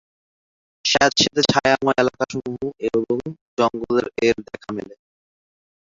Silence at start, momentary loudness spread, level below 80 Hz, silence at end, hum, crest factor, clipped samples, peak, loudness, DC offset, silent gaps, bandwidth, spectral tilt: 0.85 s; 14 LU; -54 dBFS; 1 s; none; 20 dB; under 0.1%; -2 dBFS; -20 LUFS; under 0.1%; 3.41-3.57 s; 7.8 kHz; -3.5 dB/octave